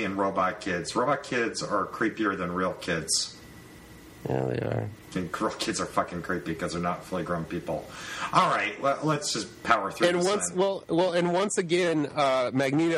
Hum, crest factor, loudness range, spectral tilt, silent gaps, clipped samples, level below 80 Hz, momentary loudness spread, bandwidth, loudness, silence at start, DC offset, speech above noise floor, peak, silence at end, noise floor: none; 22 dB; 5 LU; -4 dB/octave; none; under 0.1%; -58 dBFS; 9 LU; 15.5 kHz; -27 LUFS; 0 s; under 0.1%; 21 dB; -6 dBFS; 0 s; -48 dBFS